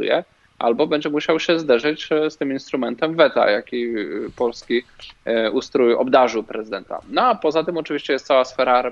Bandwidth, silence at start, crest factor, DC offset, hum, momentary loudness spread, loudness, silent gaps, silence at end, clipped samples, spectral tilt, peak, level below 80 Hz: 7.6 kHz; 0 s; 18 dB; under 0.1%; none; 9 LU; -20 LUFS; none; 0 s; under 0.1%; -5 dB/octave; -2 dBFS; -58 dBFS